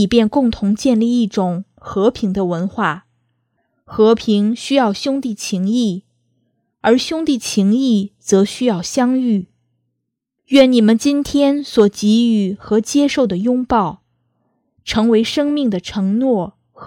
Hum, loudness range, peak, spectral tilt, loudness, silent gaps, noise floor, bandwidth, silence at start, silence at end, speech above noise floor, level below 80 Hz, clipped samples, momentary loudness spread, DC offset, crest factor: none; 4 LU; 0 dBFS; -5.5 dB/octave; -16 LUFS; none; -76 dBFS; 14.5 kHz; 0 s; 0 s; 61 dB; -48 dBFS; under 0.1%; 7 LU; under 0.1%; 16 dB